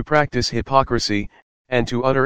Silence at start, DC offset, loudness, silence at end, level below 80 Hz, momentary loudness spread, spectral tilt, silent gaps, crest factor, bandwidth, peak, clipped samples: 0 s; 2%; -20 LUFS; 0 s; -40 dBFS; 6 LU; -5 dB/octave; 1.42-1.65 s; 18 dB; 15.5 kHz; 0 dBFS; under 0.1%